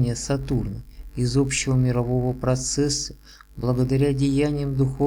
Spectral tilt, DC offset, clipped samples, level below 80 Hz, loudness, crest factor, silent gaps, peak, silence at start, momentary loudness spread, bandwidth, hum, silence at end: -5.5 dB/octave; under 0.1%; under 0.1%; -38 dBFS; -23 LUFS; 14 dB; none; -8 dBFS; 0 s; 8 LU; 12.5 kHz; none; 0 s